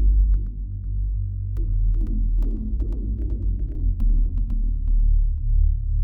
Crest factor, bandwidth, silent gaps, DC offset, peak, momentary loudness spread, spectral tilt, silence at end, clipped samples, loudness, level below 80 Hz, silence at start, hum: 10 dB; 0.7 kHz; none; under 0.1%; -10 dBFS; 5 LU; -12 dB/octave; 0 s; under 0.1%; -26 LUFS; -20 dBFS; 0 s; none